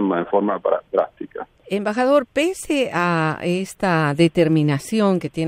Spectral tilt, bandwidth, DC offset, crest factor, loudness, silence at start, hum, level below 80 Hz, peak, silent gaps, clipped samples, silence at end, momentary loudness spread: -6 dB/octave; 16 kHz; under 0.1%; 16 dB; -20 LUFS; 0 s; none; -56 dBFS; -4 dBFS; none; under 0.1%; 0 s; 8 LU